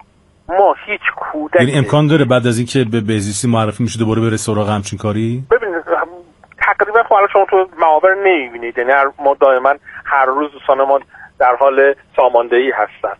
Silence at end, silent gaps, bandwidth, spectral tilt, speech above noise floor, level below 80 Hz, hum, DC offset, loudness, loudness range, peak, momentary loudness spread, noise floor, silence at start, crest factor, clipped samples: 0.05 s; none; 11.5 kHz; -5.5 dB/octave; 25 dB; -50 dBFS; none; under 0.1%; -14 LUFS; 4 LU; 0 dBFS; 7 LU; -39 dBFS; 0.5 s; 14 dB; under 0.1%